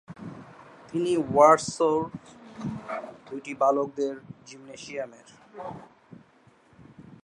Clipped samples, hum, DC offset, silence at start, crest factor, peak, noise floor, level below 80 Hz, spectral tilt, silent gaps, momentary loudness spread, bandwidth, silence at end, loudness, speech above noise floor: under 0.1%; none; under 0.1%; 0.1 s; 24 dB; -4 dBFS; -59 dBFS; -66 dBFS; -5.5 dB/octave; none; 26 LU; 11 kHz; 0.1 s; -25 LUFS; 33 dB